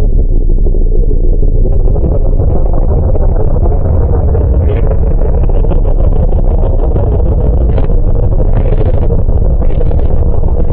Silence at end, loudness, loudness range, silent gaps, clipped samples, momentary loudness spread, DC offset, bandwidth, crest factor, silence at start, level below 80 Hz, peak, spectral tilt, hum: 0 s; -13 LUFS; 1 LU; none; under 0.1%; 3 LU; under 0.1%; 2.6 kHz; 6 dB; 0 s; -8 dBFS; 0 dBFS; -14.5 dB/octave; none